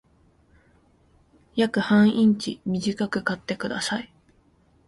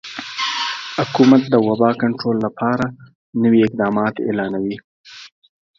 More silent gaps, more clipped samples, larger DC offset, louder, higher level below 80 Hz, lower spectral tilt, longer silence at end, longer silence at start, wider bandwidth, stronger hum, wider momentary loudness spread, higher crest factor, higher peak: second, none vs 3.15-3.33 s, 4.84-5.04 s; neither; neither; second, -24 LUFS vs -18 LUFS; about the same, -60 dBFS vs -58 dBFS; about the same, -5.5 dB/octave vs -6 dB/octave; first, 0.8 s vs 0.5 s; first, 1.55 s vs 0.05 s; first, 11.5 kHz vs 7.4 kHz; neither; second, 11 LU vs 15 LU; about the same, 16 dB vs 18 dB; second, -8 dBFS vs 0 dBFS